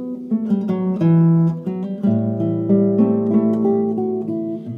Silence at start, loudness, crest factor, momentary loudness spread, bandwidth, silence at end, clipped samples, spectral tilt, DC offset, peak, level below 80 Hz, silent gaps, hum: 0 s; -18 LUFS; 14 dB; 9 LU; 3.5 kHz; 0 s; under 0.1%; -12 dB/octave; under 0.1%; -4 dBFS; -64 dBFS; none; none